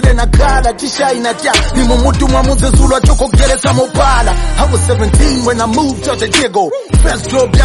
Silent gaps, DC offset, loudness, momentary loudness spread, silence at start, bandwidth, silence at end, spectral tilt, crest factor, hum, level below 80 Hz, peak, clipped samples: none; under 0.1%; -11 LUFS; 4 LU; 0 s; 11.5 kHz; 0 s; -5 dB/octave; 10 dB; none; -12 dBFS; 0 dBFS; under 0.1%